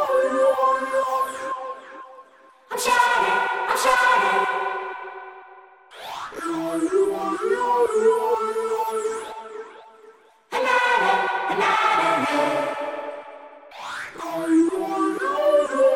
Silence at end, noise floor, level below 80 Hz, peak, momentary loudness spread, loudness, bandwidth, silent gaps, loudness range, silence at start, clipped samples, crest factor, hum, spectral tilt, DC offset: 0 s; -51 dBFS; -64 dBFS; -4 dBFS; 18 LU; -21 LUFS; 16.5 kHz; none; 4 LU; 0 s; under 0.1%; 18 dB; none; -3 dB/octave; under 0.1%